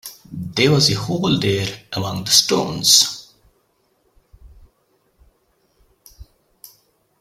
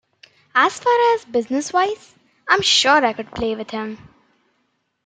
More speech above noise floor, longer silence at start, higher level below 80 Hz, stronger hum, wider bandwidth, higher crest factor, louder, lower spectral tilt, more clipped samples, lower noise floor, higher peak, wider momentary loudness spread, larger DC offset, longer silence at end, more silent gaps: second, 46 dB vs 51 dB; second, 0.05 s vs 0.55 s; about the same, -50 dBFS vs -54 dBFS; neither; first, 16.5 kHz vs 9.4 kHz; about the same, 22 dB vs 18 dB; about the same, -16 LUFS vs -18 LUFS; about the same, -3 dB/octave vs -2 dB/octave; neither; second, -64 dBFS vs -69 dBFS; about the same, 0 dBFS vs -2 dBFS; about the same, 14 LU vs 16 LU; neither; second, 0.95 s vs 1.1 s; neither